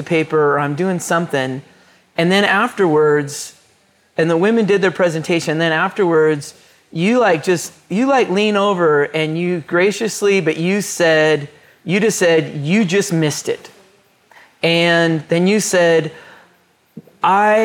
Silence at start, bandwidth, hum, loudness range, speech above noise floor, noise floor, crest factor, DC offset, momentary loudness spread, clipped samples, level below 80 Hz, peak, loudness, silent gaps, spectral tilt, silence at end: 0 s; 18.5 kHz; none; 2 LU; 40 dB; -56 dBFS; 14 dB; under 0.1%; 10 LU; under 0.1%; -66 dBFS; -2 dBFS; -16 LUFS; none; -5 dB/octave; 0 s